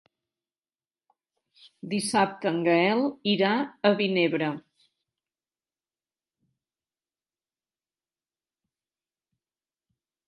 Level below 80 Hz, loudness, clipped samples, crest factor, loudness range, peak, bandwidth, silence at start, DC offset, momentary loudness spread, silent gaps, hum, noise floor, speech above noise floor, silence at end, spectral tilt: -78 dBFS; -25 LUFS; under 0.1%; 24 dB; 7 LU; -6 dBFS; 11.5 kHz; 1.85 s; under 0.1%; 9 LU; none; none; under -90 dBFS; over 65 dB; 5.7 s; -5 dB/octave